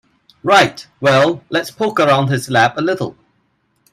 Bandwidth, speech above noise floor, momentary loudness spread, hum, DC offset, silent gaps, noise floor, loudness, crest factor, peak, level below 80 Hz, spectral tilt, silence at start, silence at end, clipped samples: 15.5 kHz; 48 dB; 9 LU; none; under 0.1%; none; -63 dBFS; -15 LUFS; 16 dB; 0 dBFS; -56 dBFS; -5 dB/octave; 0.45 s; 0.8 s; under 0.1%